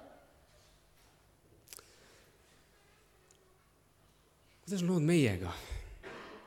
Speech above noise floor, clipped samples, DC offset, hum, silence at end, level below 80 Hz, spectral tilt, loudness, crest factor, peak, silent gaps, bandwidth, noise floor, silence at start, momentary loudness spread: 36 dB; under 0.1%; under 0.1%; none; 0.05 s; -58 dBFS; -6 dB/octave; -34 LUFS; 22 dB; -18 dBFS; none; 16.5 kHz; -67 dBFS; 0 s; 24 LU